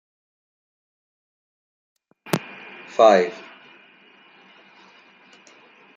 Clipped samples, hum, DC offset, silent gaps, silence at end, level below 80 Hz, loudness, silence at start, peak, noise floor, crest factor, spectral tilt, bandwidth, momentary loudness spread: under 0.1%; none; under 0.1%; none; 2.6 s; -74 dBFS; -19 LUFS; 2.25 s; -2 dBFS; -53 dBFS; 24 dB; -5 dB/octave; 10 kHz; 25 LU